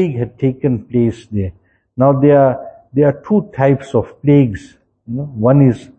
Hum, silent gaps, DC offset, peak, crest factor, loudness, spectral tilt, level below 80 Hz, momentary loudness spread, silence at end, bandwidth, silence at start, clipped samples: none; none; under 0.1%; 0 dBFS; 14 dB; -15 LUFS; -10 dB/octave; -46 dBFS; 14 LU; 0.15 s; 8.4 kHz; 0 s; under 0.1%